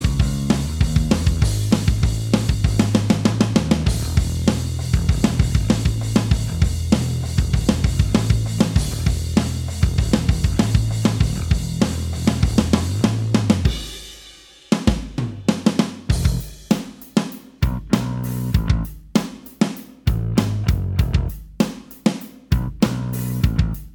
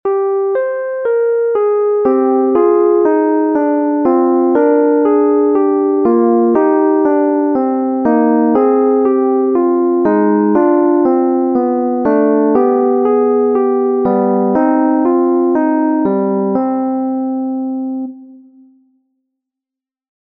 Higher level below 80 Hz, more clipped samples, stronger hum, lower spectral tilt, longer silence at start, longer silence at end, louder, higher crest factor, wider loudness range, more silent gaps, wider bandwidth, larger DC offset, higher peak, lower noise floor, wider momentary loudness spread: first, -26 dBFS vs -58 dBFS; neither; neither; second, -6 dB/octave vs -11.5 dB/octave; about the same, 0 s vs 0.05 s; second, 0.05 s vs 1.95 s; second, -20 LUFS vs -13 LUFS; first, 18 dB vs 12 dB; about the same, 3 LU vs 4 LU; neither; first, over 20 kHz vs 2.9 kHz; neither; about the same, -2 dBFS vs 0 dBFS; second, -44 dBFS vs -86 dBFS; about the same, 5 LU vs 5 LU